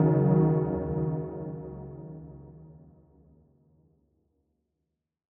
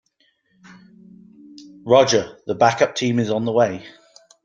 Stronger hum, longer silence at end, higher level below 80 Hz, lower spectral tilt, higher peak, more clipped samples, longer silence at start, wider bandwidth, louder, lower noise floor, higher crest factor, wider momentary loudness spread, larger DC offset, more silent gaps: neither; first, 2.55 s vs 0.55 s; first, -52 dBFS vs -62 dBFS; first, -13 dB/octave vs -4.5 dB/octave; second, -12 dBFS vs -2 dBFS; neither; second, 0 s vs 1.55 s; second, 2.6 kHz vs 9 kHz; second, -27 LUFS vs -18 LUFS; first, -84 dBFS vs -64 dBFS; about the same, 20 dB vs 20 dB; first, 24 LU vs 13 LU; neither; neither